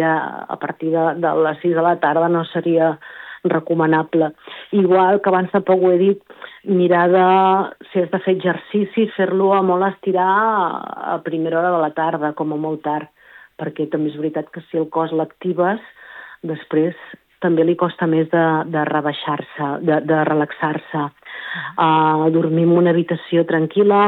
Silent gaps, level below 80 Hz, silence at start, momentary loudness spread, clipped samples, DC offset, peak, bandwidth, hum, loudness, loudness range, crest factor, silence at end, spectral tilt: none; -72 dBFS; 0 s; 12 LU; under 0.1%; under 0.1%; -4 dBFS; 4.1 kHz; none; -18 LUFS; 6 LU; 14 dB; 0 s; -10 dB/octave